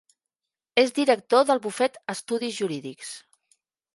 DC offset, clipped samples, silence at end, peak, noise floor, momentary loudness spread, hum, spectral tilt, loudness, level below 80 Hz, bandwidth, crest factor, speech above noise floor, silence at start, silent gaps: under 0.1%; under 0.1%; 0.75 s; -4 dBFS; -89 dBFS; 17 LU; none; -3.5 dB/octave; -24 LUFS; -80 dBFS; 11.5 kHz; 22 dB; 65 dB; 0.75 s; none